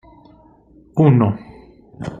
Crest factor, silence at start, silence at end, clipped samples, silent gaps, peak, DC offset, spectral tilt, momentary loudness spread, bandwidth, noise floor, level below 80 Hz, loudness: 18 dB; 0.95 s; 0.05 s; under 0.1%; none; -2 dBFS; under 0.1%; -10.5 dB/octave; 18 LU; 7.2 kHz; -49 dBFS; -50 dBFS; -16 LUFS